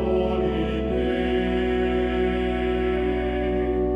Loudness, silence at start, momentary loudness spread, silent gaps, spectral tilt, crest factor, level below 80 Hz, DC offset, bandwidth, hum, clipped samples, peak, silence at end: -24 LUFS; 0 s; 2 LU; none; -8 dB/octave; 12 dB; -32 dBFS; under 0.1%; 5.4 kHz; none; under 0.1%; -12 dBFS; 0 s